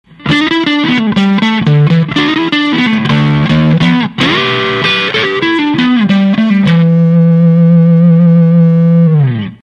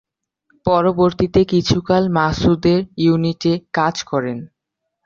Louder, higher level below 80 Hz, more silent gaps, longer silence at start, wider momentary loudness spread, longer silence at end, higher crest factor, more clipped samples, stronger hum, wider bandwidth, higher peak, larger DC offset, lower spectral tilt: first, -9 LUFS vs -17 LUFS; about the same, -42 dBFS vs -40 dBFS; neither; second, 0.2 s vs 0.65 s; second, 4 LU vs 7 LU; second, 0.1 s vs 0.6 s; second, 8 dB vs 16 dB; neither; neither; about the same, 7 kHz vs 7.4 kHz; about the same, 0 dBFS vs -2 dBFS; neither; about the same, -7.5 dB/octave vs -6.5 dB/octave